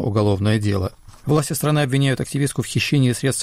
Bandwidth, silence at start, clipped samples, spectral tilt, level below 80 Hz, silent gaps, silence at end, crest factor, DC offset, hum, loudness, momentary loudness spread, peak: 15.5 kHz; 0 s; under 0.1%; -5.5 dB/octave; -46 dBFS; none; 0 s; 12 dB; under 0.1%; none; -20 LUFS; 5 LU; -8 dBFS